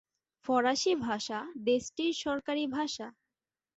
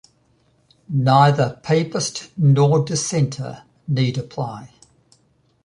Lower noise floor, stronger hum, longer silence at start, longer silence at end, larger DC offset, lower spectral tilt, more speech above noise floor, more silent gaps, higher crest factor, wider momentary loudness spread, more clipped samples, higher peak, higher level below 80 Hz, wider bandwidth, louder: first, under -90 dBFS vs -61 dBFS; neither; second, 0.45 s vs 0.9 s; second, 0.65 s vs 1 s; neither; second, -3 dB/octave vs -6 dB/octave; first, over 59 dB vs 43 dB; neither; about the same, 18 dB vs 18 dB; second, 9 LU vs 16 LU; neither; second, -16 dBFS vs -2 dBFS; second, -70 dBFS vs -58 dBFS; second, 8.2 kHz vs 11 kHz; second, -32 LUFS vs -19 LUFS